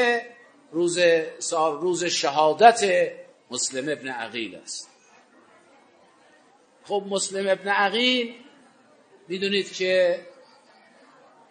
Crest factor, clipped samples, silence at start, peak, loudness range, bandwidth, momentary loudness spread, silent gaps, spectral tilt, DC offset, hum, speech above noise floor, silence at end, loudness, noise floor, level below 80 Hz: 24 dB; under 0.1%; 0 s; 0 dBFS; 11 LU; 9.6 kHz; 15 LU; none; -2.5 dB/octave; under 0.1%; none; 34 dB; 1.2 s; -23 LUFS; -57 dBFS; -82 dBFS